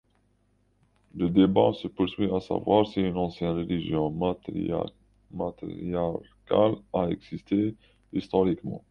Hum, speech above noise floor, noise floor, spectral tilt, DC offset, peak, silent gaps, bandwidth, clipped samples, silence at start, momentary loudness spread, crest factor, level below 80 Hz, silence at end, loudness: none; 41 dB; -68 dBFS; -9 dB/octave; under 0.1%; -6 dBFS; none; 6.8 kHz; under 0.1%; 1.15 s; 12 LU; 20 dB; -52 dBFS; 0.15 s; -27 LUFS